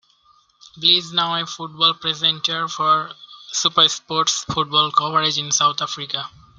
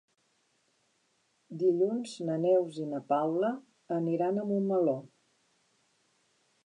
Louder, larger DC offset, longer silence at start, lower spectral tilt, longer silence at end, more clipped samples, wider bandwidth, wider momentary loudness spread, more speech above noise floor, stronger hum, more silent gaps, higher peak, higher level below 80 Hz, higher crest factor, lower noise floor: first, -18 LUFS vs -30 LUFS; neither; second, 0.75 s vs 1.5 s; second, -1.5 dB/octave vs -7.5 dB/octave; second, 0.3 s vs 1.6 s; neither; first, 13 kHz vs 11 kHz; about the same, 11 LU vs 9 LU; second, 37 dB vs 44 dB; neither; neither; first, 0 dBFS vs -16 dBFS; first, -62 dBFS vs -88 dBFS; about the same, 20 dB vs 16 dB; second, -57 dBFS vs -74 dBFS